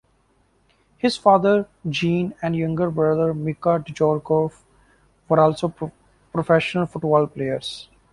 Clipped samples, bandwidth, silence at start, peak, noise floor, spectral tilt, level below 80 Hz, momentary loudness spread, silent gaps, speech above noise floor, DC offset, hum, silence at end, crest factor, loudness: under 0.1%; 11.5 kHz; 1.05 s; -2 dBFS; -62 dBFS; -7 dB/octave; -56 dBFS; 11 LU; none; 42 dB; under 0.1%; none; 0.3 s; 20 dB; -21 LUFS